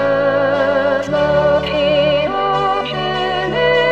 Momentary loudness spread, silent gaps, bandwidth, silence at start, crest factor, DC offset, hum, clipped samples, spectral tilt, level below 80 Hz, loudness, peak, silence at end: 4 LU; none; 8.2 kHz; 0 s; 12 dB; 0.5%; none; under 0.1%; -6 dB/octave; -40 dBFS; -15 LUFS; -2 dBFS; 0 s